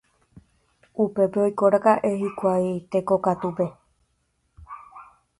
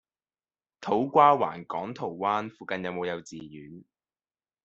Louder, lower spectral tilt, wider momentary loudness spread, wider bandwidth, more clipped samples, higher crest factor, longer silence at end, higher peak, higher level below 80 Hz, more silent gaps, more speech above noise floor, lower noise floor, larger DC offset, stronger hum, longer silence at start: first, -23 LUFS vs -27 LUFS; first, -8 dB/octave vs -4 dB/octave; about the same, 21 LU vs 23 LU; first, 11.5 kHz vs 7.8 kHz; neither; about the same, 20 dB vs 24 dB; second, 0.35 s vs 0.85 s; about the same, -4 dBFS vs -6 dBFS; first, -60 dBFS vs -72 dBFS; neither; second, 49 dB vs over 63 dB; second, -71 dBFS vs under -90 dBFS; neither; neither; first, 0.95 s vs 0.8 s